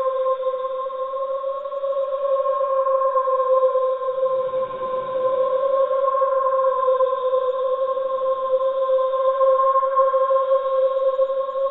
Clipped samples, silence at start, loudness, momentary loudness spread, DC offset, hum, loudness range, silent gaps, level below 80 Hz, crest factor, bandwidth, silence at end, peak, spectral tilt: under 0.1%; 0 s; -21 LUFS; 7 LU; under 0.1%; none; 2 LU; none; -66 dBFS; 12 dB; 4 kHz; 0 s; -8 dBFS; -6.5 dB/octave